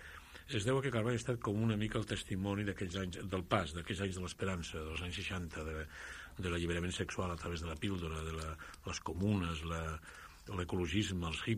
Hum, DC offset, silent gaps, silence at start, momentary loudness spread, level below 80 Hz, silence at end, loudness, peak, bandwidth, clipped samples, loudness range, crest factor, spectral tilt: none; under 0.1%; none; 0 s; 10 LU; -52 dBFS; 0 s; -39 LUFS; -14 dBFS; 15.5 kHz; under 0.1%; 3 LU; 24 dB; -5.5 dB/octave